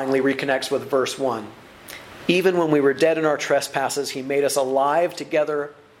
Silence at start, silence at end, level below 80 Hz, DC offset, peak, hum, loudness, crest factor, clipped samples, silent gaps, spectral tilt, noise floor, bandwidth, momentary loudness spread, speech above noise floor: 0 s; 0.3 s; -66 dBFS; under 0.1%; -4 dBFS; none; -21 LUFS; 18 dB; under 0.1%; none; -4 dB/octave; -41 dBFS; 16 kHz; 12 LU; 20 dB